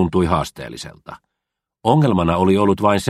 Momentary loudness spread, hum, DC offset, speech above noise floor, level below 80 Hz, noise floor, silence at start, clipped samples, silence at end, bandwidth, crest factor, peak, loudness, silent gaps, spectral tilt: 16 LU; none; under 0.1%; 65 dB; -40 dBFS; -82 dBFS; 0 s; under 0.1%; 0 s; 14 kHz; 18 dB; 0 dBFS; -17 LUFS; none; -7 dB/octave